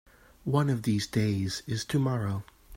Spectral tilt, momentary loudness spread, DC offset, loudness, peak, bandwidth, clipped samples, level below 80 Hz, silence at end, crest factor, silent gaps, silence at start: -6 dB/octave; 7 LU; under 0.1%; -29 LUFS; -10 dBFS; 16 kHz; under 0.1%; -58 dBFS; 0 s; 18 dB; none; 0.45 s